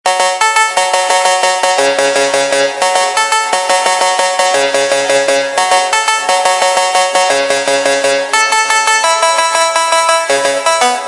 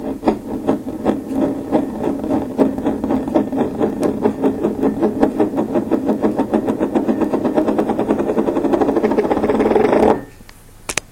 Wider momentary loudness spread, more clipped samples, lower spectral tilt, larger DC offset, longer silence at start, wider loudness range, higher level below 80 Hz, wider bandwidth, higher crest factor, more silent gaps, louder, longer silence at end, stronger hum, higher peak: second, 2 LU vs 6 LU; neither; second, 0.5 dB/octave vs -6.5 dB/octave; neither; about the same, 0.05 s vs 0 s; about the same, 1 LU vs 3 LU; second, -60 dBFS vs -42 dBFS; second, 11.5 kHz vs 16.5 kHz; second, 12 dB vs 18 dB; neither; first, -10 LUFS vs -18 LUFS; about the same, 0 s vs 0.05 s; neither; about the same, 0 dBFS vs 0 dBFS